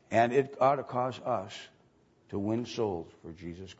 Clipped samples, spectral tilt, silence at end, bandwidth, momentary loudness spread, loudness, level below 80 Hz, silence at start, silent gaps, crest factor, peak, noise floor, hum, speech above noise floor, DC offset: under 0.1%; -6.5 dB/octave; 0.05 s; 8 kHz; 18 LU; -31 LUFS; -66 dBFS; 0.1 s; none; 20 dB; -12 dBFS; -65 dBFS; none; 34 dB; under 0.1%